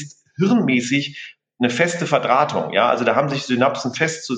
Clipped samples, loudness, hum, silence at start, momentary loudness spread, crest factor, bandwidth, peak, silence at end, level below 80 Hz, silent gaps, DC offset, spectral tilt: under 0.1%; -19 LUFS; none; 0 s; 7 LU; 18 dB; 9.4 kHz; -2 dBFS; 0 s; -68 dBFS; none; under 0.1%; -5 dB/octave